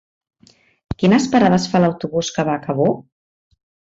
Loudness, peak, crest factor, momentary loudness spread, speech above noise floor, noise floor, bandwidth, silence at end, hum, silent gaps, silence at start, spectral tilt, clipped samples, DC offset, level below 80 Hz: -17 LUFS; -2 dBFS; 16 dB; 8 LU; 38 dB; -54 dBFS; 8 kHz; 1 s; none; none; 1 s; -6 dB/octave; under 0.1%; under 0.1%; -48 dBFS